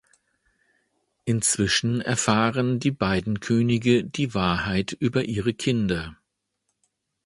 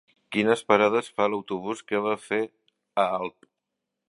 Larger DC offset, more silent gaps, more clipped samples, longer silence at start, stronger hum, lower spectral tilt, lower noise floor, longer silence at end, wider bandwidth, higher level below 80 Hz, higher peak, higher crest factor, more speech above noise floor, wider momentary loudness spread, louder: neither; neither; neither; first, 1.25 s vs 0.3 s; neither; about the same, -4.5 dB/octave vs -5 dB/octave; second, -77 dBFS vs -84 dBFS; first, 1.15 s vs 0.8 s; about the same, 11.5 kHz vs 11.5 kHz; first, -48 dBFS vs -72 dBFS; about the same, -4 dBFS vs -2 dBFS; about the same, 20 dB vs 24 dB; second, 54 dB vs 58 dB; second, 6 LU vs 11 LU; first, -23 LUFS vs -26 LUFS